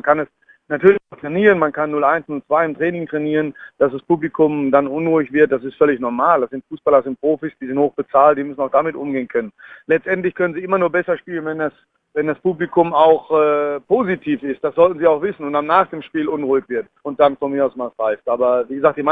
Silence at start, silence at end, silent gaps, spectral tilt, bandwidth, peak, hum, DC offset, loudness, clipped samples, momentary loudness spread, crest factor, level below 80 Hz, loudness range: 0.05 s; 0 s; none; -9 dB/octave; 3.9 kHz; 0 dBFS; none; under 0.1%; -18 LUFS; under 0.1%; 9 LU; 18 dB; -60 dBFS; 3 LU